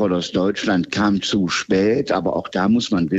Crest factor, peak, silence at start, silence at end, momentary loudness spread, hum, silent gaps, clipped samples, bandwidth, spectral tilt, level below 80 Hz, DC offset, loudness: 14 dB; -6 dBFS; 0 s; 0 s; 3 LU; none; none; under 0.1%; 8.2 kHz; -5.5 dB/octave; -52 dBFS; under 0.1%; -19 LUFS